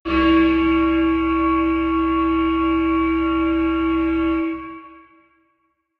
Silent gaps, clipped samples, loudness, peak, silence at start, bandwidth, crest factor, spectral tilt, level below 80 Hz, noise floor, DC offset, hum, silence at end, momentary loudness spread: none; under 0.1%; -19 LUFS; -6 dBFS; 0.05 s; 4.8 kHz; 12 dB; -8 dB/octave; -36 dBFS; -68 dBFS; under 0.1%; none; 1.05 s; 6 LU